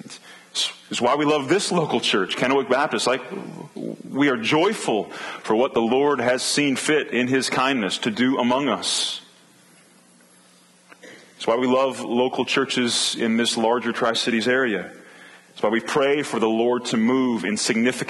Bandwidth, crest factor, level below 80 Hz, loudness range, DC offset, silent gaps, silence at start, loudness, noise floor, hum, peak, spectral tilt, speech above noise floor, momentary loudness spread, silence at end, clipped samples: 12.5 kHz; 16 dB; -70 dBFS; 4 LU; under 0.1%; none; 0.05 s; -21 LUFS; -54 dBFS; none; -6 dBFS; -3.5 dB/octave; 33 dB; 9 LU; 0 s; under 0.1%